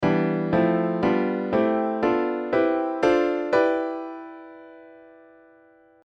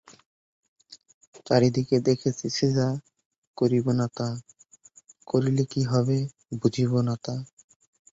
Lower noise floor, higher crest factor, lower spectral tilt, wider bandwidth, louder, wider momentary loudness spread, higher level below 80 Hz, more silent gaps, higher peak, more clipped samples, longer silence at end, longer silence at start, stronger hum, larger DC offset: about the same, -55 dBFS vs -56 dBFS; second, 16 dB vs 22 dB; first, -8 dB/octave vs -6.5 dB/octave; about the same, 7.4 kHz vs 7.8 kHz; first, -23 LUFS vs -26 LUFS; first, 14 LU vs 11 LU; about the same, -58 dBFS vs -60 dBFS; second, none vs 1.14-1.21 s, 1.27-1.32 s, 3.25-3.31 s, 3.38-3.54 s; about the same, -8 dBFS vs -6 dBFS; neither; first, 1.1 s vs 0.65 s; second, 0 s vs 0.9 s; neither; neither